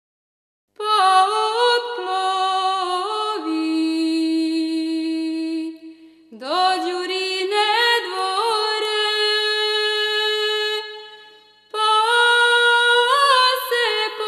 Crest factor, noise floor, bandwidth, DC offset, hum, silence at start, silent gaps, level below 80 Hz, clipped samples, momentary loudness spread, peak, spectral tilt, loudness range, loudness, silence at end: 16 dB; -49 dBFS; 14 kHz; under 0.1%; 50 Hz at -75 dBFS; 0.8 s; none; -84 dBFS; under 0.1%; 10 LU; -4 dBFS; 0 dB/octave; 6 LU; -18 LUFS; 0 s